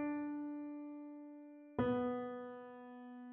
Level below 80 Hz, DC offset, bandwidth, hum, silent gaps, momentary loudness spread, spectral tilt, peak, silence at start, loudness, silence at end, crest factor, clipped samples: -72 dBFS; under 0.1%; 4 kHz; none; none; 16 LU; -6.5 dB/octave; -24 dBFS; 0 s; -44 LUFS; 0 s; 18 dB; under 0.1%